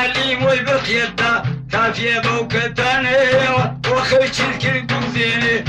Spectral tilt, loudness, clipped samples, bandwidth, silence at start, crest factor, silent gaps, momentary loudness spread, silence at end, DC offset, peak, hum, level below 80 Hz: -4.5 dB/octave; -16 LUFS; under 0.1%; 10.5 kHz; 0 s; 12 dB; none; 5 LU; 0 s; under 0.1%; -6 dBFS; none; -44 dBFS